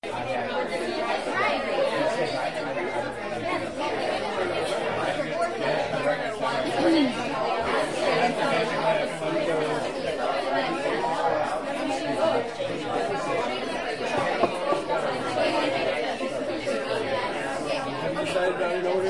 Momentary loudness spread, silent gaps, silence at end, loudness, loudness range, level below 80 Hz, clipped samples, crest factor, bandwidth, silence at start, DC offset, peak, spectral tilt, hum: 5 LU; none; 0 s; -26 LUFS; 3 LU; -58 dBFS; under 0.1%; 18 dB; 11.5 kHz; 0 s; 0.3%; -8 dBFS; -4.5 dB/octave; none